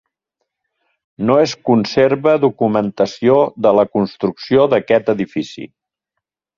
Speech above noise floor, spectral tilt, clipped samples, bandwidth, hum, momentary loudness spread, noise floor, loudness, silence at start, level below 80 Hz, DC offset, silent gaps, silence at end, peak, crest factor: 65 dB; -6.5 dB/octave; under 0.1%; 7.2 kHz; none; 9 LU; -79 dBFS; -15 LUFS; 1.2 s; -56 dBFS; under 0.1%; none; 0.9 s; 0 dBFS; 16 dB